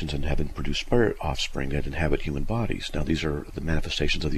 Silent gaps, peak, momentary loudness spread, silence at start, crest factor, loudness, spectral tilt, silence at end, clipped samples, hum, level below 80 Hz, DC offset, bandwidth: none; -8 dBFS; 6 LU; 0 s; 18 dB; -28 LUFS; -5.5 dB/octave; 0 s; under 0.1%; none; -30 dBFS; under 0.1%; 12 kHz